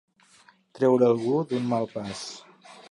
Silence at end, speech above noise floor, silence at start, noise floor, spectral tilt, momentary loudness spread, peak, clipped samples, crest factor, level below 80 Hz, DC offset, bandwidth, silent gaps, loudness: 0.15 s; 34 dB; 0.75 s; -58 dBFS; -6.5 dB/octave; 16 LU; -10 dBFS; under 0.1%; 18 dB; -68 dBFS; under 0.1%; 11 kHz; none; -25 LUFS